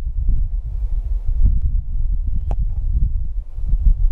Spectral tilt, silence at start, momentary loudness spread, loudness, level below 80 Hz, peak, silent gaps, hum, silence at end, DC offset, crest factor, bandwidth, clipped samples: -11 dB/octave; 0 s; 6 LU; -24 LUFS; -18 dBFS; -4 dBFS; none; none; 0 s; under 0.1%; 14 dB; 1.1 kHz; under 0.1%